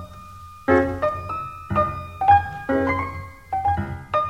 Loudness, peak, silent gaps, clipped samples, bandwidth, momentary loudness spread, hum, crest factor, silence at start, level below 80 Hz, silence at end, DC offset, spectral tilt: -22 LUFS; -4 dBFS; none; under 0.1%; 15.5 kHz; 15 LU; none; 18 dB; 0 s; -42 dBFS; 0 s; 0.2%; -7.5 dB/octave